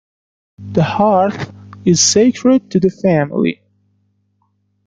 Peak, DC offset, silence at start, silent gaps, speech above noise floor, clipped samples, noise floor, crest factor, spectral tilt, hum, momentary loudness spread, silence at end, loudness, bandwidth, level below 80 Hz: 0 dBFS; under 0.1%; 0.6 s; none; 50 dB; under 0.1%; -63 dBFS; 16 dB; -4.5 dB/octave; 50 Hz at -35 dBFS; 10 LU; 1.35 s; -14 LUFS; 9.6 kHz; -52 dBFS